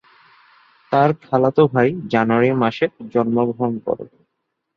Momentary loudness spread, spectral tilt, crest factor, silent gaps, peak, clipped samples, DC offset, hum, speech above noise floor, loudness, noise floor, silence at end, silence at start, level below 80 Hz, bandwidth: 9 LU; -9 dB/octave; 18 dB; none; -2 dBFS; under 0.1%; under 0.1%; none; 58 dB; -18 LUFS; -75 dBFS; 0.7 s; 0.9 s; -60 dBFS; 6.6 kHz